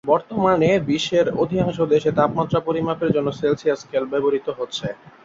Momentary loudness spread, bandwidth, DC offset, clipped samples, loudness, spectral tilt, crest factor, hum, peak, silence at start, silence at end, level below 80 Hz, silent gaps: 7 LU; 7.8 kHz; under 0.1%; under 0.1%; -20 LUFS; -6.5 dB/octave; 16 dB; none; -4 dBFS; 0.05 s; 0.15 s; -52 dBFS; none